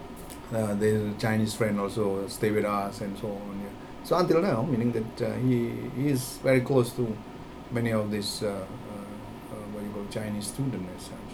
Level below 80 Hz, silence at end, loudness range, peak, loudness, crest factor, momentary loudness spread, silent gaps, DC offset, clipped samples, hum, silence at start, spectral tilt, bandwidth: -52 dBFS; 0 s; 6 LU; -10 dBFS; -29 LUFS; 18 dB; 15 LU; none; under 0.1%; under 0.1%; none; 0 s; -6 dB/octave; over 20 kHz